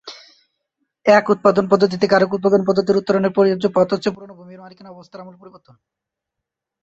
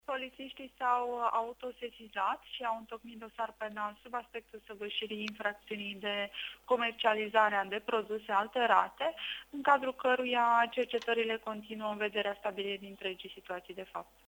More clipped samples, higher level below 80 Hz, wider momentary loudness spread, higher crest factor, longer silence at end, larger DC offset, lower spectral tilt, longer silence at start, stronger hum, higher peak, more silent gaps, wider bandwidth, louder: neither; first, -60 dBFS vs -72 dBFS; first, 23 LU vs 15 LU; about the same, 18 dB vs 22 dB; first, 1.35 s vs 0.25 s; neither; first, -6.5 dB/octave vs -4 dB/octave; about the same, 0.05 s vs 0.1 s; neither; first, -2 dBFS vs -12 dBFS; neither; second, 7.8 kHz vs over 20 kHz; first, -16 LUFS vs -34 LUFS